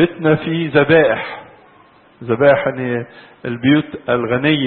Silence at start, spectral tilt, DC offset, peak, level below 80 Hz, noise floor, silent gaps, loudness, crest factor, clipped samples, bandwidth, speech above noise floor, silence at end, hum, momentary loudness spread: 0 s; -12 dB/octave; under 0.1%; 0 dBFS; -52 dBFS; -48 dBFS; none; -15 LUFS; 16 dB; under 0.1%; 4.4 kHz; 33 dB; 0 s; none; 17 LU